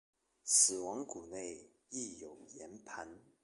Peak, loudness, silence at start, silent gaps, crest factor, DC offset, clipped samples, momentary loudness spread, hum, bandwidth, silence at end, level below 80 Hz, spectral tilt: -14 dBFS; -34 LUFS; 0.45 s; none; 26 dB; under 0.1%; under 0.1%; 25 LU; none; 12 kHz; 0.25 s; -78 dBFS; -0.5 dB/octave